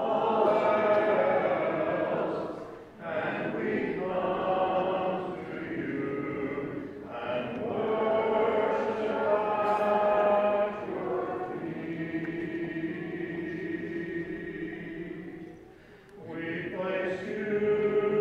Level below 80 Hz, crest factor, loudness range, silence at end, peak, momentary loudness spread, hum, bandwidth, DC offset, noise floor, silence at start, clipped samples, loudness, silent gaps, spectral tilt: -64 dBFS; 16 dB; 9 LU; 0 s; -12 dBFS; 13 LU; none; 8 kHz; under 0.1%; -52 dBFS; 0 s; under 0.1%; -30 LUFS; none; -7.5 dB/octave